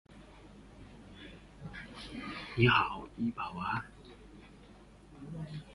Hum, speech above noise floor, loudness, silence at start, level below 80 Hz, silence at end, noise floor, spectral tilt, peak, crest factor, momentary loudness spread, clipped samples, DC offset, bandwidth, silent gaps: none; 25 dB; -34 LUFS; 0.1 s; -56 dBFS; 0 s; -56 dBFS; -6.5 dB/octave; -12 dBFS; 26 dB; 27 LU; under 0.1%; under 0.1%; 11.5 kHz; none